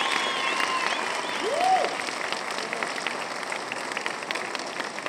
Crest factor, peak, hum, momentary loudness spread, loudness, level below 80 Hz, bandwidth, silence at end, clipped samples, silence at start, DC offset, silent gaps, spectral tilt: 20 dB; -8 dBFS; none; 7 LU; -27 LUFS; -82 dBFS; 16 kHz; 0 s; under 0.1%; 0 s; under 0.1%; none; -1 dB/octave